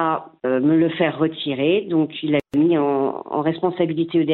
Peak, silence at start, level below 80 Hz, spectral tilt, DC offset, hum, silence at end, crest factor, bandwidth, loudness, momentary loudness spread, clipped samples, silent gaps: -4 dBFS; 0 s; -62 dBFS; -9 dB/octave; under 0.1%; none; 0 s; 14 dB; 4.2 kHz; -20 LUFS; 5 LU; under 0.1%; none